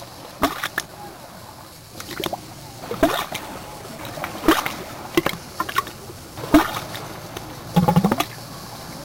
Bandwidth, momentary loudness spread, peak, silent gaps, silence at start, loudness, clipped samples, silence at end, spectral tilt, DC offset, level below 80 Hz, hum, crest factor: 17 kHz; 19 LU; -2 dBFS; none; 0 s; -23 LUFS; under 0.1%; 0 s; -5 dB/octave; under 0.1%; -44 dBFS; none; 22 dB